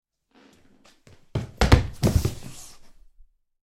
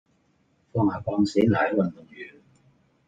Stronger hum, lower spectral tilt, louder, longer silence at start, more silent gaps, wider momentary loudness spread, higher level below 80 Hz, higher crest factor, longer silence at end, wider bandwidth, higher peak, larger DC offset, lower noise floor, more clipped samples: neither; second, -6 dB/octave vs -7.5 dB/octave; about the same, -24 LUFS vs -24 LUFS; first, 1.35 s vs 0.75 s; neither; about the same, 23 LU vs 21 LU; first, -32 dBFS vs -60 dBFS; about the same, 24 dB vs 20 dB; about the same, 0.75 s vs 0.8 s; first, 16 kHz vs 9 kHz; first, -2 dBFS vs -8 dBFS; neither; second, -58 dBFS vs -66 dBFS; neither